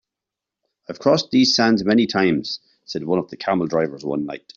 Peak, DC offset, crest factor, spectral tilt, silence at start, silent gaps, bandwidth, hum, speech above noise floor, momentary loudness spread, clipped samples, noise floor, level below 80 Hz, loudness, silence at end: -4 dBFS; under 0.1%; 18 dB; -5 dB/octave; 0.9 s; none; 7.4 kHz; none; 66 dB; 14 LU; under 0.1%; -86 dBFS; -60 dBFS; -20 LUFS; 0.2 s